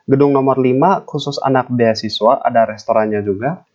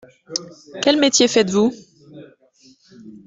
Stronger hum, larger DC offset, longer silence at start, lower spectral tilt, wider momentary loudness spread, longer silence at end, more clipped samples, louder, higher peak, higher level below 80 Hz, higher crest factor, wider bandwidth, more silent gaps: neither; neither; second, 0.1 s vs 0.3 s; first, -7 dB/octave vs -3 dB/octave; second, 6 LU vs 14 LU; about the same, 0.15 s vs 0.1 s; neither; about the same, -15 LUFS vs -17 LUFS; about the same, 0 dBFS vs -2 dBFS; about the same, -60 dBFS vs -62 dBFS; about the same, 14 dB vs 18 dB; second, 7.6 kHz vs 8.4 kHz; neither